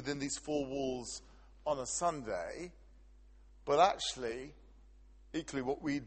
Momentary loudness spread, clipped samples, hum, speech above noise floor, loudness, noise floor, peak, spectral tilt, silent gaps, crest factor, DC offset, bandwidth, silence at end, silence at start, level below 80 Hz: 17 LU; under 0.1%; none; 23 dB; -36 LUFS; -59 dBFS; -14 dBFS; -3.5 dB/octave; none; 24 dB; under 0.1%; 8.8 kHz; 0 s; 0 s; -60 dBFS